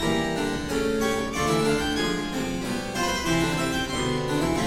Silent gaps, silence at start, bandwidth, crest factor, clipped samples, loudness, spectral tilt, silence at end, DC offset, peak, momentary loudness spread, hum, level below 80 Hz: none; 0 s; 16.5 kHz; 14 dB; under 0.1%; -25 LUFS; -4.5 dB/octave; 0 s; under 0.1%; -12 dBFS; 5 LU; none; -40 dBFS